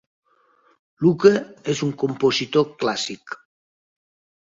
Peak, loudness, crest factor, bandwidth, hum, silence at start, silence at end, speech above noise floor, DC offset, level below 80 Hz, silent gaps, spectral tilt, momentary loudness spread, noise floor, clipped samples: -2 dBFS; -21 LUFS; 22 dB; 7.8 kHz; none; 1 s; 1.05 s; 40 dB; under 0.1%; -64 dBFS; none; -5 dB/octave; 15 LU; -60 dBFS; under 0.1%